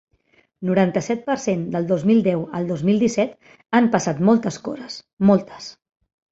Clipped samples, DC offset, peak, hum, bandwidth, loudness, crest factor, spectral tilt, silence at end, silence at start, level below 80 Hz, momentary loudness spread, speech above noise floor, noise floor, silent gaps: under 0.1%; under 0.1%; -2 dBFS; none; 8 kHz; -20 LUFS; 18 dB; -6.5 dB/octave; 0.6 s; 0.6 s; -58 dBFS; 13 LU; 41 dB; -61 dBFS; 5.13-5.17 s